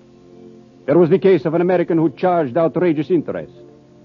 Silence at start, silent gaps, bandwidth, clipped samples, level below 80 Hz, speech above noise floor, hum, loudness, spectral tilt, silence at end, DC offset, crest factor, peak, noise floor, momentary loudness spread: 0.45 s; none; 5.4 kHz; under 0.1%; -62 dBFS; 27 dB; none; -16 LUFS; -10 dB/octave; 0.6 s; under 0.1%; 14 dB; -2 dBFS; -43 dBFS; 15 LU